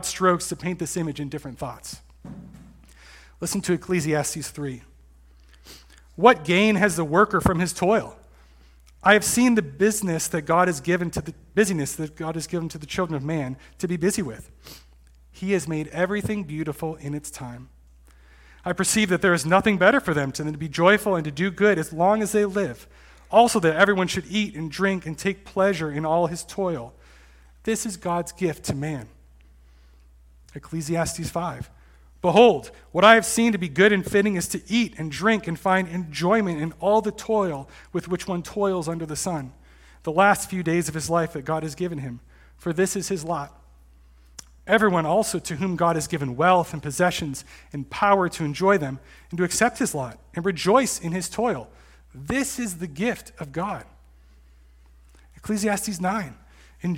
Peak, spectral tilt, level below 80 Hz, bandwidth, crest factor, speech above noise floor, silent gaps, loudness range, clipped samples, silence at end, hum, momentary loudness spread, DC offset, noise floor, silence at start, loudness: 0 dBFS; -4.5 dB/octave; -50 dBFS; 17 kHz; 24 dB; 29 dB; none; 10 LU; under 0.1%; 0 s; none; 15 LU; under 0.1%; -52 dBFS; 0 s; -23 LUFS